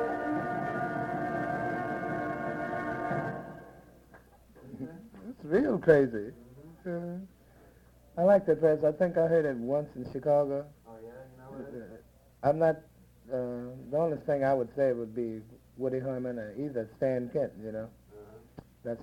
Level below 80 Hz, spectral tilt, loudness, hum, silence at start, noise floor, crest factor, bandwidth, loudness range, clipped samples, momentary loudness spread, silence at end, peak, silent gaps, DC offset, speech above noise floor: -62 dBFS; -8.5 dB/octave; -31 LUFS; none; 0 s; -58 dBFS; 24 dB; 13 kHz; 7 LU; under 0.1%; 21 LU; 0 s; -8 dBFS; none; under 0.1%; 29 dB